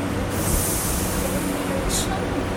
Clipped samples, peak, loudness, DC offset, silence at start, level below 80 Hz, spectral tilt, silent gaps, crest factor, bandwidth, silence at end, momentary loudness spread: under 0.1%; -8 dBFS; -23 LUFS; under 0.1%; 0 s; -32 dBFS; -4 dB/octave; none; 16 dB; 17 kHz; 0 s; 3 LU